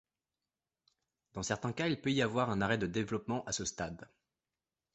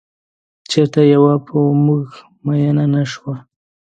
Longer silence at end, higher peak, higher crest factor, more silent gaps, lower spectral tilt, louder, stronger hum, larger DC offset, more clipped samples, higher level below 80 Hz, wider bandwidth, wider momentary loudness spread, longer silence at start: first, 0.9 s vs 0.55 s; second, -16 dBFS vs 0 dBFS; first, 22 dB vs 16 dB; neither; second, -4.5 dB/octave vs -7.5 dB/octave; second, -35 LUFS vs -15 LUFS; neither; neither; neither; about the same, -62 dBFS vs -60 dBFS; about the same, 8.2 kHz vs 9 kHz; second, 10 LU vs 16 LU; first, 1.35 s vs 0.7 s